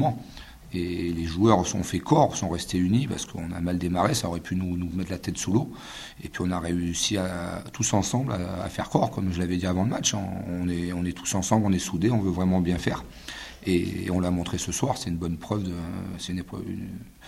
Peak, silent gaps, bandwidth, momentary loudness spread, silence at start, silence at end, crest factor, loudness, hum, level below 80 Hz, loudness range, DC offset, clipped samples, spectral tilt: -4 dBFS; none; 15.5 kHz; 11 LU; 0 s; 0 s; 22 dB; -27 LUFS; none; -48 dBFS; 4 LU; under 0.1%; under 0.1%; -5 dB/octave